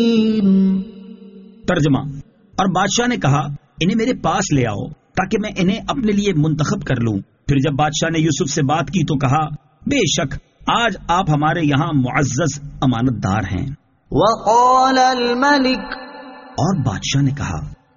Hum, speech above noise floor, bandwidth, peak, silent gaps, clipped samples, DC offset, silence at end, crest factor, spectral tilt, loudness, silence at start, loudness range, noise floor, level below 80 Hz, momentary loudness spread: none; 23 dB; 7.4 kHz; -2 dBFS; none; under 0.1%; under 0.1%; 0.2 s; 16 dB; -5 dB/octave; -17 LUFS; 0 s; 3 LU; -40 dBFS; -40 dBFS; 12 LU